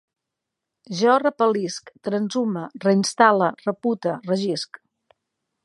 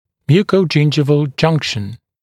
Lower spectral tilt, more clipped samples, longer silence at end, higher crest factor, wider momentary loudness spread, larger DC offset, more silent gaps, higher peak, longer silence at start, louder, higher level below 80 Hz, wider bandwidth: second, -5 dB/octave vs -6.5 dB/octave; neither; first, 1 s vs 0.25 s; first, 22 dB vs 14 dB; first, 13 LU vs 9 LU; neither; neither; about the same, -2 dBFS vs 0 dBFS; first, 0.9 s vs 0.3 s; second, -22 LUFS vs -15 LUFS; second, -76 dBFS vs -50 dBFS; about the same, 11.5 kHz vs 10.5 kHz